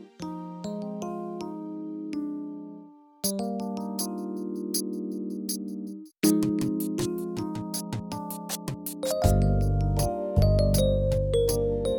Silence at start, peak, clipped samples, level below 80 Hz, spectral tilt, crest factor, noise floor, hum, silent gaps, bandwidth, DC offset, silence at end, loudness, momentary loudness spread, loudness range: 0 s; -8 dBFS; under 0.1%; -36 dBFS; -6 dB/octave; 20 dB; -49 dBFS; none; none; 19 kHz; under 0.1%; 0 s; -29 LUFS; 13 LU; 8 LU